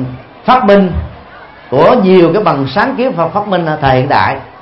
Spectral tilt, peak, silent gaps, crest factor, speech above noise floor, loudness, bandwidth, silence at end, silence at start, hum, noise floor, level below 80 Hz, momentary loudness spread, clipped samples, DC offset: -9 dB/octave; 0 dBFS; none; 10 dB; 24 dB; -10 LUFS; 5.8 kHz; 0.1 s; 0 s; none; -34 dBFS; -32 dBFS; 10 LU; 0.2%; under 0.1%